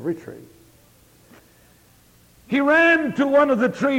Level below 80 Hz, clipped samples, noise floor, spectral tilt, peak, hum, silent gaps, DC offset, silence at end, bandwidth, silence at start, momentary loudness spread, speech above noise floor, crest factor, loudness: -60 dBFS; under 0.1%; -54 dBFS; -6 dB/octave; -6 dBFS; none; none; under 0.1%; 0 s; 16.5 kHz; 0 s; 16 LU; 35 dB; 16 dB; -18 LUFS